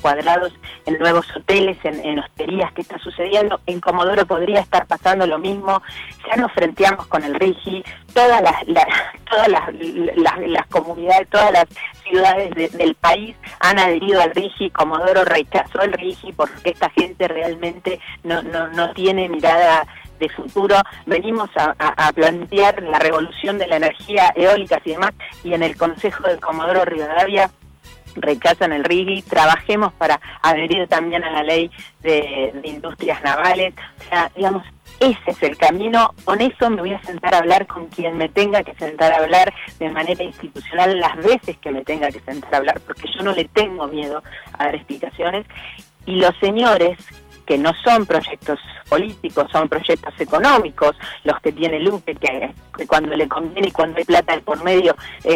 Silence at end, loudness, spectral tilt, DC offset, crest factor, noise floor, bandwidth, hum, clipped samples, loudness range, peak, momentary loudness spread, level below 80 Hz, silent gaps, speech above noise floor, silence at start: 0 s; -17 LUFS; -4.5 dB/octave; under 0.1%; 10 dB; -43 dBFS; 16.5 kHz; none; under 0.1%; 4 LU; -6 dBFS; 11 LU; -48 dBFS; none; 25 dB; 0 s